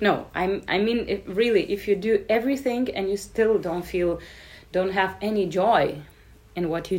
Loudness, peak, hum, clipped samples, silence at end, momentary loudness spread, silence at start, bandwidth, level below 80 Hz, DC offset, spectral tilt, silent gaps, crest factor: -24 LUFS; -6 dBFS; none; under 0.1%; 0 s; 8 LU; 0 s; 16 kHz; -50 dBFS; under 0.1%; -5.5 dB/octave; none; 18 dB